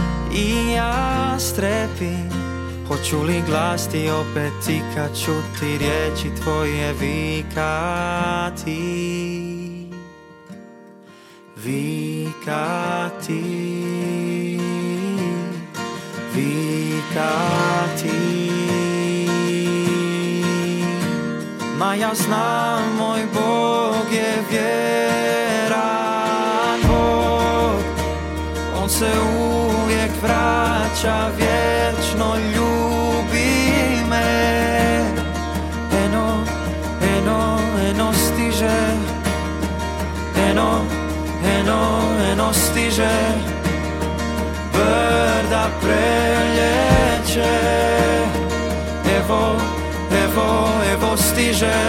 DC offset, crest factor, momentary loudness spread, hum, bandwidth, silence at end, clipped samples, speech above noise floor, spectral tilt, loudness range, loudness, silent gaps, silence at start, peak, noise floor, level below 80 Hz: under 0.1%; 18 dB; 8 LU; none; 16.5 kHz; 0 s; under 0.1%; 26 dB; -5 dB/octave; 7 LU; -20 LUFS; none; 0 s; -2 dBFS; -44 dBFS; -30 dBFS